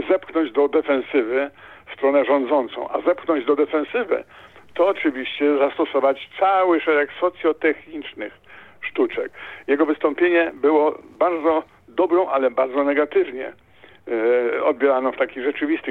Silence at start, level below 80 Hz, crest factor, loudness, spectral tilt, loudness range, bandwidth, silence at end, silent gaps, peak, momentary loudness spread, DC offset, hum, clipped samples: 0 s; -64 dBFS; 16 dB; -20 LUFS; -6.5 dB/octave; 2 LU; 4.3 kHz; 0 s; none; -4 dBFS; 11 LU; under 0.1%; none; under 0.1%